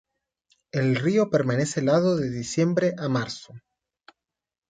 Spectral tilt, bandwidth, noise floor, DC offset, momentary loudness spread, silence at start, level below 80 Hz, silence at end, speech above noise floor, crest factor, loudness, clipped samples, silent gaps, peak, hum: -6 dB/octave; 9.4 kHz; -74 dBFS; under 0.1%; 7 LU; 0.75 s; -62 dBFS; 1.1 s; 50 dB; 18 dB; -24 LUFS; under 0.1%; none; -8 dBFS; none